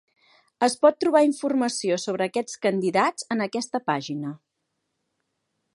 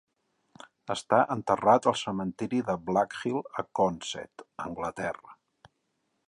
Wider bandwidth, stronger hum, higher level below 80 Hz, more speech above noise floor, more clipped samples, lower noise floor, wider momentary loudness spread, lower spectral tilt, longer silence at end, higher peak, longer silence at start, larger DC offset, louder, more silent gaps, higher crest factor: about the same, 11.5 kHz vs 11.5 kHz; neither; second, -76 dBFS vs -64 dBFS; first, 55 dB vs 49 dB; neither; about the same, -78 dBFS vs -77 dBFS; second, 8 LU vs 16 LU; about the same, -4.5 dB/octave vs -5 dB/octave; first, 1.4 s vs 0.95 s; first, -4 dBFS vs -8 dBFS; second, 0.6 s vs 0.9 s; neither; first, -24 LUFS vs -29 LUFS; neither; about the same, 22 dB vs 22 dB